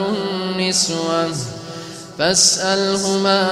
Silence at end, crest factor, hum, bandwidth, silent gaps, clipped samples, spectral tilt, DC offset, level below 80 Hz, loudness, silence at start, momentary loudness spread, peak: 0 s; 18 dB; none; 13.5 kHz; none; under 0.1%; -2.5 dB/octave; under 0.1%; -54 dBFS; -17 LUFS; 0 s; 18 LU; 0 dBFS